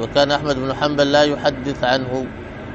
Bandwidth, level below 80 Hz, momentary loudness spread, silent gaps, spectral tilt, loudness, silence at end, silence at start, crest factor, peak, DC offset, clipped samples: 8 kHz; -42 dBFS; 11 LU; none; -5 dB/octave; -18 LUFS; 0 s; 0 s; 16 dB; -2 dBFS; under 0.1%; under 0.1%